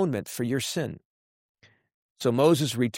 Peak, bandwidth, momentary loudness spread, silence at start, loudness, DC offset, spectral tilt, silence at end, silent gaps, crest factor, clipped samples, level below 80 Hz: -8 dBFS; 16 kHz; 12 LU; 0 s; -26 LUFS; under 0.1%; -5.5 dB/octave; 0 s; 1.05-1.55 s, 1.94-2.15 s; 18 dB; under 0.1%; -66 dBFS